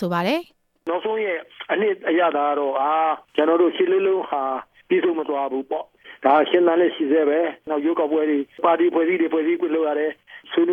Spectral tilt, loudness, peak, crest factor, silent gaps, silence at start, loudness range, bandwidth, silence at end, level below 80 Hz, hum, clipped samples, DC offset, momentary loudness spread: -7 dB/octave; -21 LUFS; -4 dBFS; 16 dB; none; 0 s; 2 LU; 6 kHz; 0 s; -72 dBFS; none; under 0.1%; under 0.1%; 9 LU